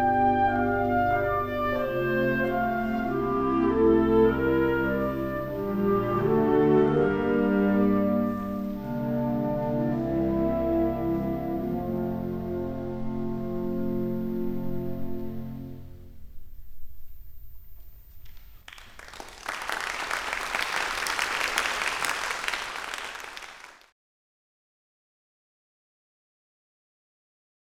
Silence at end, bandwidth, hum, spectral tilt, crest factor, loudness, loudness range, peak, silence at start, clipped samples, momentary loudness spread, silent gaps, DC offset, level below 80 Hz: 3.9 s; 17 kHz; none; -5.5 dB/octave; 22 dB; -26 LUFS; 14 LU; -6 dBFS; 0 s; under 0.1%; 13 LU; none; under 0.1%; -46 dBFS